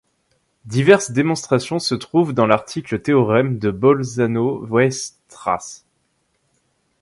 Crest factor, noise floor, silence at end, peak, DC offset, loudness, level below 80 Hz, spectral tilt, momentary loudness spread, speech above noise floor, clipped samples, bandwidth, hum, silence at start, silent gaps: 18 dB; -67 dBFS; 1.25 s; 0 dBFS; under 0.1%; -18 LUFS; -54 dBFS; -5.5 dB/octave; 11 LU; 49 dB; under 0.1%; 11.5 kHz; none; 0.65 s; none